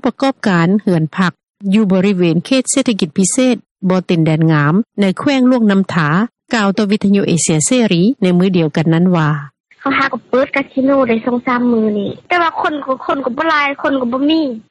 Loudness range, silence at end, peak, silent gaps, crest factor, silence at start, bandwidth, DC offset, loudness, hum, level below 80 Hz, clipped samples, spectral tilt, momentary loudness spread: 2 LU; 0.1 s; 0 dBFS; 3.71-3.76 s, 9.60-9.64 s; 12 dB; 0.05 s; 11.5 kHz; under 0.1%; -14 LUFS; none; -54 dBFS; under 0.1%; -5.5 dB/octave; 5 LU